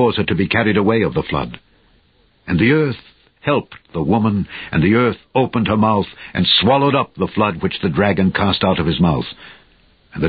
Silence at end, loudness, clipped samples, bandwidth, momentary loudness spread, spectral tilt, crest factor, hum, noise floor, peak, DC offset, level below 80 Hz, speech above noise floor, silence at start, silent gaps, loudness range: 0 s; -17 LUFS; under 0.1%; 5 kHz; 10 LU; -11.5 dB/octave; 16 dB; none; -56 dBFS; 0 dBFS; under 0.1%; -38 dBFS; 40 dB; 0 s; none; 4 LU